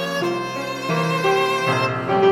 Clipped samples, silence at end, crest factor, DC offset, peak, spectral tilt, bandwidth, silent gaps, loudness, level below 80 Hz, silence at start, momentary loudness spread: under 0.1%; 0 s; 14 dB; under 0.1%; -6 dBFS; -5 dB/octave; 16.5 kHz; none; -20 LUFS; -60 dBFS; 0 s; 7 LU